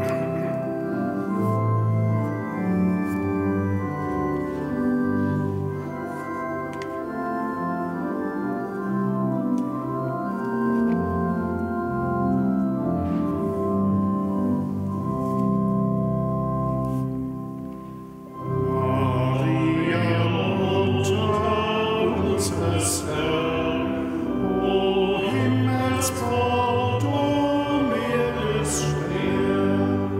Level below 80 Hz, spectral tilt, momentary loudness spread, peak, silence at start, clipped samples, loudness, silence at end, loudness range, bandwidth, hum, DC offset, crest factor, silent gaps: -46 dBFS; -6 dB/octave; 6 LU; -10 dBFS; 0 s; under 0.1%; -24 LUFS; 0 s; 4 LU; 16 kHz; none; under 0.1%; 14 dB; none